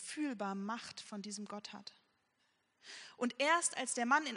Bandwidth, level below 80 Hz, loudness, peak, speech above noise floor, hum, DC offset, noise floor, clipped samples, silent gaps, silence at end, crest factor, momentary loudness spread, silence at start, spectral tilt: 10.5 kHz; -90 dBFS; -37 LUFS; -18 dBFS; 40 dB; none; under 0.1%; -79 dBFS; under 0.1%; none; 0 s; 22 dB; 19 LU; 0 s; -2.5 dB/octave